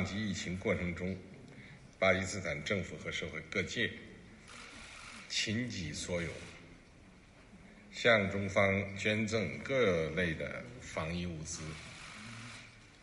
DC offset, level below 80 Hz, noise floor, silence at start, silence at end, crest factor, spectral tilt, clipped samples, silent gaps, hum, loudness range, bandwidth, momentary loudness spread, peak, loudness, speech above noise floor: under 0.1%; -60 dBFS; -58 dBFS; 0 s; 0 s; 24 dB; -4.5 dB/octave; under 0.1%; none; none; 8 LU; 11.5 kHz; 20 LU; -14 dBFS; -35 LUFS; 23 dB